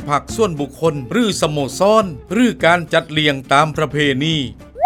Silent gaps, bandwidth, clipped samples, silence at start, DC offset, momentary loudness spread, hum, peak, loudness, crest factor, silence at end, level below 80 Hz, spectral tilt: none; 16.5 kHz; under 0.1%; 0 s; under 0.1%; 6 LU; none; 0 dBFS; -16 LUFS; 16 dB; 0 s; -42 dBFS; -5 dB/octave